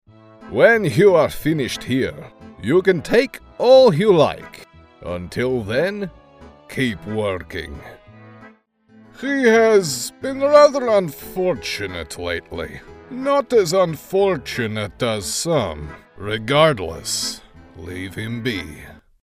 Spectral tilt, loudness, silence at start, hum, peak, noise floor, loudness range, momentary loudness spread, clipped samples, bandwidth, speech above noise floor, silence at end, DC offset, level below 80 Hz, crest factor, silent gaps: -4.5 dB/octave; -18 LUFS; 0.4 s; none; 0 dBFS; -52 dBFS; 8 LU; 19 LU; under 0.1%; 16 kHz; 34 dB; 0.3 s; under 0.1%; -48 dBFS; 20 dB; none